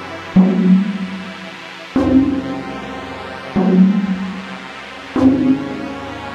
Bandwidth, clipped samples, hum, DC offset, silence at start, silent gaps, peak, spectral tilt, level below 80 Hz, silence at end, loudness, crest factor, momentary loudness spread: 7.6 kHz; under 0.1%; none; under 0.1%; 0 s; none; 0 dBFS; -8 dB/octave; -44 dBFS; 0 s; -16 LUFS; 16 dB; 17 LU